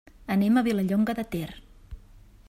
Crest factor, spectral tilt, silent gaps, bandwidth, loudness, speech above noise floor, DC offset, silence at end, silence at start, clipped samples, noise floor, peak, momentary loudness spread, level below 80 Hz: 16 dB; -7 dB/octave; none; 15.5 kHz; -26 LUFS; 27 dB; under 0.1%; 0.5 s; 0.2 s; under 0.1%; -51 dBFS; -12 dBFS; 11 LU; -50 dBFS